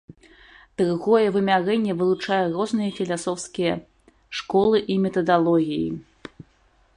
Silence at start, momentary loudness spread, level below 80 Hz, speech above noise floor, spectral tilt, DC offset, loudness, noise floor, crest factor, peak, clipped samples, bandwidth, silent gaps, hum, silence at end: 0.8 s; 14 LU; -58 dBFS; 39 dB; -6 dB/octave; under 0.1%; -22 LUFS; -60 dBFS; 18 dB; -6 dBFS; under 0.1%; 11 kHz; none; none; 0.55 s